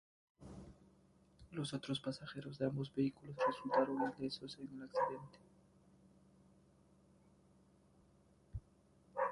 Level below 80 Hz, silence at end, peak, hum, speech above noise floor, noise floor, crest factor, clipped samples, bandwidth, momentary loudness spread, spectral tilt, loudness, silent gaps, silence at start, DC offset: -68 dBFS; 0 s; -22 dBFS; none; 29 dB; -70 dBFS; 22 dB; under 0.1%; 11.5 kHz; 20 LU; -6 dB/octave; -41 LUFS; none; 0.4 s; under 0.1%